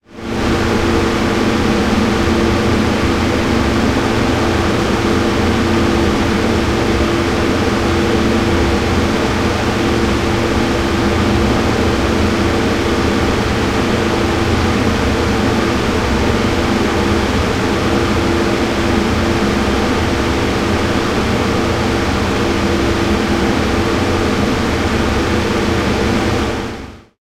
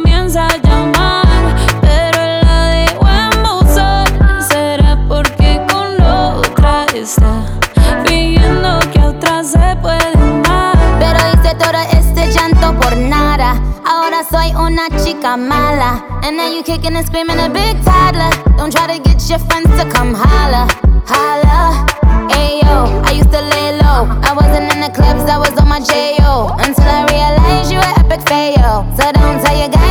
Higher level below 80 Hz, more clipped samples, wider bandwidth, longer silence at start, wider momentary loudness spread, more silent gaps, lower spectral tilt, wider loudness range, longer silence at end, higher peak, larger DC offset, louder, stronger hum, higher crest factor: second, -26 dBFS vs -12 dBFS; neither; about the same, 16 kHz vs 17 kHz; about the same, 0.1 s vs 0 s; second, 1 LU vs 4 LU; neither; about the same, -5.5 dB/octave vs -5.5 dB/octave; about the same, 1 LU vs 2 LU; first, 0.2 s vs 0 s; about the same, 0 dBFS vs 0 dBFS; neither; second, -15 LUFS vs -11 LUFS; neither; first, 14 dB vs 8 dB